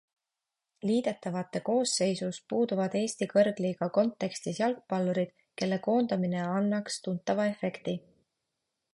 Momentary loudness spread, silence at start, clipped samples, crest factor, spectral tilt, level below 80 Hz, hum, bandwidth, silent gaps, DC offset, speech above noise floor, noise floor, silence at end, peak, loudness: 8 LU; 0.85 s; under 0.1%; 18 dB; -5.5 dB/octave; -74 dBFS; none; 11.5 kHz; none; under 0.1%; 59 dB; -88 dBFS; 0.95 s; -12 dBFS; -30 LUFS